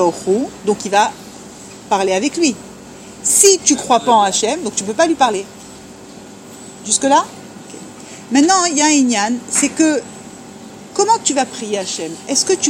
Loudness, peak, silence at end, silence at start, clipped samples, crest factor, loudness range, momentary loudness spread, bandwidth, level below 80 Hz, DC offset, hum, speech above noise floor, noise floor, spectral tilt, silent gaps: -15 LUFS; 0 dBFS; 0 s; 0 s; under 0.1%; 16 dB; 4 LU; 23 LU; 16.5 kHz; -56 dBFS; under 0.1%; none; 21 dB; -36 dBFS; -2 dB/octave; none